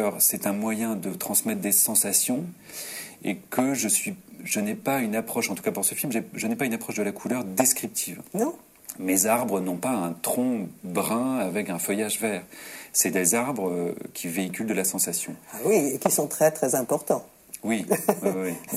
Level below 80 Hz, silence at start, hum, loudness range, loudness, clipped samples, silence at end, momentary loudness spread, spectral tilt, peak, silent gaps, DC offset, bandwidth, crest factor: -70 dBFS; 0 s; none; 3 LU; -25 LUFS; under 0.1%; 0 s; 11 LU; -3.5 dB/octave; -4 dBFS; none; under 0.1%; 16.5 kHz; 22 dB